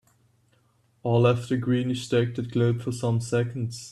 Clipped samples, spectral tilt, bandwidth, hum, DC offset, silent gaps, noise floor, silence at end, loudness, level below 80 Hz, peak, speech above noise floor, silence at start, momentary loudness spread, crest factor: under 0.1%; -7 dB/octave; 12 kHz; none; under 0.1%; none; -65 dBFS; 0 s; -25 LUFS; -60 dBFS; -10 dBFS; 41 dB; 1.05 s; 7 LU; 16 dB